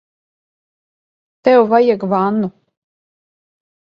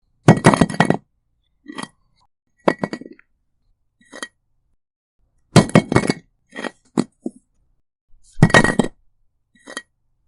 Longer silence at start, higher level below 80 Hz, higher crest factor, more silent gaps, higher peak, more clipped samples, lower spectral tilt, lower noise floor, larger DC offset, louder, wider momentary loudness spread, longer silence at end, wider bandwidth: first, 1.45 s vs 0.25 s; second, -64 dBFS vs -42 dBFS; about the same, 18 dB vs 20 dB; second, none vs 4.96-5.19 s, 8.01-8.08 s; about the same, 0 dBFS vs 0 dBFS; neither; first, -8.5 dB/octave vs -6 dB/octave; first, under -90 dBFS vs -67 dBFS; neither; first, -14 LUFS vs -17 LUFS; second, 9 LU vs 21 LU; first, 1.4 s vs 0.5 s; second, 5.6 kHz vs 11.5 kHz